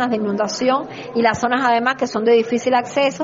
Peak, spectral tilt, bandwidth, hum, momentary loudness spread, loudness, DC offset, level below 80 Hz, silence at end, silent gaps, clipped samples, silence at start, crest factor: -2 dBFS; -3 dB/octave; 7.8 kHz; none; 4 LU; -18 LUFS; under 0.1%; -58 dBFS; 0 s; none; under 0.1%; 0 s; 16 dB